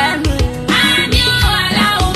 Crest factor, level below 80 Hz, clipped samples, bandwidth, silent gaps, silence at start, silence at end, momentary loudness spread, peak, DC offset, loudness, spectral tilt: 14 dB; -22 dBFS; under 0.1%; 14.5 kHz; none; 0 s; 0 s; 5 LU; 0 dBFS; under 0.1%; -12 LUFS; -4 dB/octave